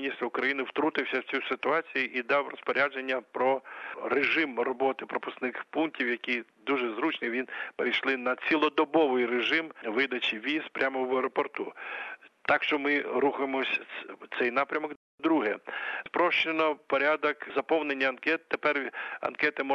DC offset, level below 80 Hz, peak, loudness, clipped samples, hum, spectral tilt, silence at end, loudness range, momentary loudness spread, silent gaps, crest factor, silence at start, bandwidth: under 0.1%; -80 dBFS; -10 dBFS; -29 LUFS; under 0.1%; none; -5 dB/octave; 0 s; 3 LU; 9 LU; 14.96-15.18 s; 20 dB; 0 s; 7.4 kHz